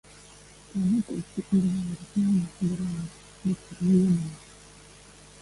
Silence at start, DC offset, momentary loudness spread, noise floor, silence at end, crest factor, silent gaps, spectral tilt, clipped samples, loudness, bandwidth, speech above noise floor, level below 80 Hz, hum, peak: 0.75 s; under 0.1%; 15 LU; -51 dBFS; 0.95 s; 16 dB; none; -7.5 dB/octave; under 0.1%; -27 LUFS; 11.5 kHz; 25 dB; -56 dBFS; 50 Hz at -40 dBFS; -12 dBFS